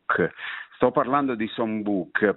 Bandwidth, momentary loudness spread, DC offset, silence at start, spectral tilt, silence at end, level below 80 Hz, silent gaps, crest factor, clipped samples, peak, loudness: 4.1 kHz; 6 LU; under 0.1%; 0.1 s; -10 dB/octave; 0 s; -62 dBFS; none; 20 dB; under 0.1%; -4 dBFS; -25 LUFS